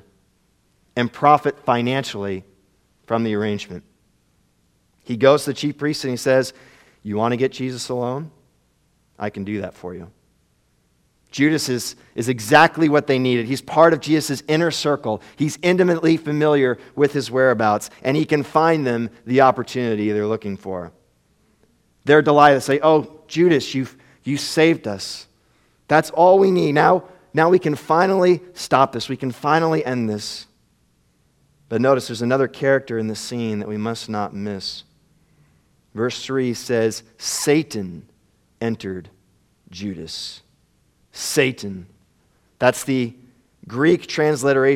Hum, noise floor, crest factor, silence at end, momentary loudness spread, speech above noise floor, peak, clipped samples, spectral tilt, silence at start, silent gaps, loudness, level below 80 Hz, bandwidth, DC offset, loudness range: none; -63 dBFS; 20 dB; 0 s; 15 LU; 44 dB; 0 dBFS; under 0.1%; -5 dB/octave; 0.95 s; none; -19 LUFS; -62 dBFS; 16.5 kHz; under 0.1%; 9 LU